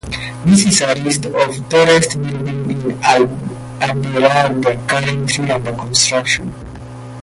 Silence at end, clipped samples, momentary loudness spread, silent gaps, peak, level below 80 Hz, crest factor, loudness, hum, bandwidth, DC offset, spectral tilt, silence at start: 0 s; under 0.1%; 14 LU; none; 0 dBFS; -42 dBFS; 16 dB; -14 LUFS; none; 11.5 kHz; under 0.1%; -4 dB/octave; 0.05 s